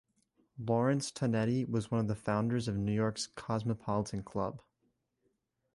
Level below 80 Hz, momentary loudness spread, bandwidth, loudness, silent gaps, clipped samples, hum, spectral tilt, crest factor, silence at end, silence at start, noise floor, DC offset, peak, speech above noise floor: -62 dBFS; 7 LU; 11.5 kHz; -34 LUFS; none; under 0.1%; none; -6.5 dB/octave; 16 dB; 1.15 s; 0.55 s; -79 dBFS; under 0.1%; -18 dBFS; 46 dB